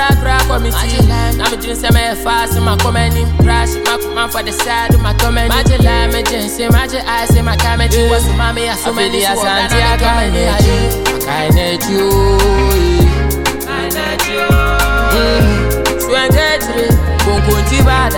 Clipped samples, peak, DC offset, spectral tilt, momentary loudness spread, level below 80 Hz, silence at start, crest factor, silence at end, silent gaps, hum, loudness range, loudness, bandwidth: under 0.1%; 0 dBFS; under 0.1%; -4.5 dB/octave; 5 LU; -16 dBFS; 0 s; 12 dB; 0 s; none; none; 1 LU; -12 LUFS; 18.5 kHz